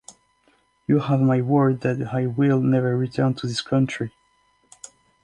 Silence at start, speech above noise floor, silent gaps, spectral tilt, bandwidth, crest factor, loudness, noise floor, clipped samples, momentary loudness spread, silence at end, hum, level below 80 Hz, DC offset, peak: 0.9 s; 43 dB; none; -7.5 dB/octave; 10.5 kHz; 16 dB; -22 LUFS; -63 dBFS; under 0.1%; 15 LU; 1.15 s; none; -60 dBFS; under 0.1%; -6 dBFS